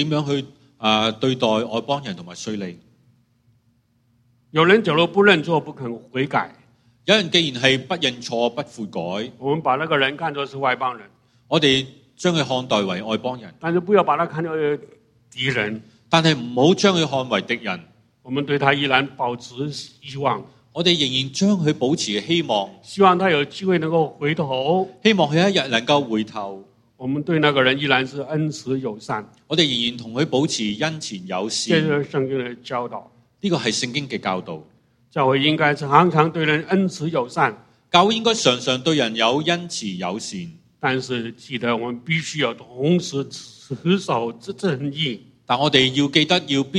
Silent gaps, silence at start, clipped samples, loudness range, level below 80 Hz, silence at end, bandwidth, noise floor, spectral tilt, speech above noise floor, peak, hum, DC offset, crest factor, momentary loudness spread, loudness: none; 0 s; under 0.1%; 5 LU; -62 dBFS; 0 s; 11.5 kHz; -63 dBFS; -4.5 dB/octave; 42 dB; 0 dBFS; none; under 0.1%; 20 dB; 13 LU; -20 LUFS